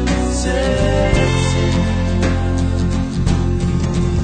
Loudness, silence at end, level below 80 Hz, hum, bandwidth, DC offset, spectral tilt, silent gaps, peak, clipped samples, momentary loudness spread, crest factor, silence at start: -17 LUFS; 0 s; -22 dBFS; none; 9.4 kHz; under 0.1%; -6 dB/octave; none; -2 dBFS; under 0.1%; 3 LU; 14 dB; 0 s